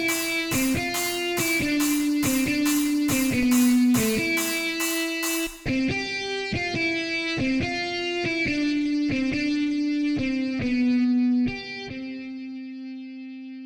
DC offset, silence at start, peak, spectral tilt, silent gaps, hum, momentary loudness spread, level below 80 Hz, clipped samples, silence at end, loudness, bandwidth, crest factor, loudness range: under 0.1%; 0 s; -10 dBFS; -3.5 dB/octave; none; none; 13 LU; -48 dBFS; under 0.1%; 0 s; -24 LUFS; over 20 kHz; 14 dB; 4 LU